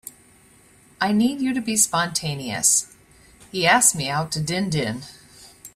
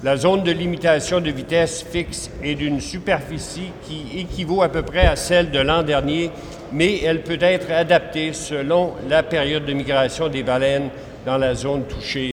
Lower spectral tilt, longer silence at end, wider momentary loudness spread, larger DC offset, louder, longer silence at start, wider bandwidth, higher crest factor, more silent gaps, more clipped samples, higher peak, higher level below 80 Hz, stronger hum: second, -2.5 dB/octave vs -5 dB/octave; about the same, 0.05 s vs 0.05 s; first, 16 LU vs 11 LU; neither; about the same, -20 LUFS vs -20 LUFS; about the same, 0.05 s vs 0 s; about the same, 16 kHz vs 16.5 kHz; about the same, 22 dB vs 18 dB; neither; neither; about the same, -2 dBFS vs -2 dBFS; second, -56 dBFS vs -34 dBFS; neither